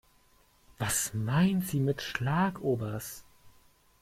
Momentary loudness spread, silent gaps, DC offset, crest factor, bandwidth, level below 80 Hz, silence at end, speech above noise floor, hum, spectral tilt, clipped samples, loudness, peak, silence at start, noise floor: 11 LU; none; under 0.1%; 18 dB; 16 kHz; -58 dBFS; 0.55 s; 35 dB; none; -5 dB/octave; under 0.1%; -30 LUFS; -14 dBFS; 0.8 s; -64 dBFS